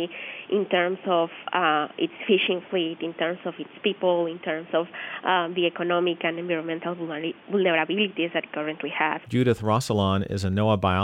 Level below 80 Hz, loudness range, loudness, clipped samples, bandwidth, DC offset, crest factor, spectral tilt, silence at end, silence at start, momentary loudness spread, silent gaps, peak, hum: -60 dBFS; 2 LU; -25 LUFS; under 0.1%; 14 kHz; under 0.1%; 16 dB; -6 dB/octave; 0 s; 0 s; 8 LU; none; -8 dBFS; none